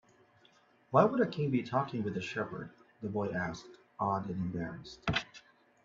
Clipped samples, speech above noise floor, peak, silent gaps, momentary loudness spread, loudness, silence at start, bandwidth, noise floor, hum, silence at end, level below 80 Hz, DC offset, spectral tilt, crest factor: under 0.1%; 33 dB; -10 dBFS; none; 17 LU; -34 LUFS; 0.9 s; 7.6 kHz; -66 dBFS; none; 0.45 s; -64 dBFS; under 0.1%; -7 dB/octave; 26 dB